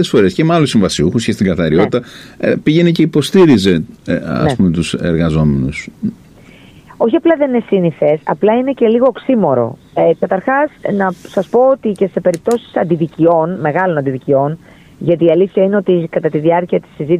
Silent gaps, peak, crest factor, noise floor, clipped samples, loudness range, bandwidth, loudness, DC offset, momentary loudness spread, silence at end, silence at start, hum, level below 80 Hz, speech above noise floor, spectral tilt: none; 0 dBFS; 12 dB; -40 dBFS; under 0.1%; 3 LU; 14 kHz; -13 LUFS; under 0.1%; 7 LU; 0 s; 0 s; none; -40 dBFS; 27 dB; -7 dB/octave